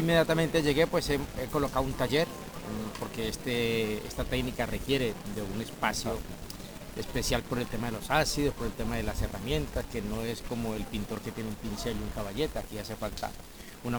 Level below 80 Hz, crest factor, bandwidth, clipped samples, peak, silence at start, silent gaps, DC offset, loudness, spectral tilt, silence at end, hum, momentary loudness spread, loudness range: -42 dBFS; 22 dB; over 20 kHz; under 0.1%; -10 dBFS; 0 s; none; 0.2%; -32 LUFS; -5 dB/octave; 0 s; none; 12 LU; 5 LU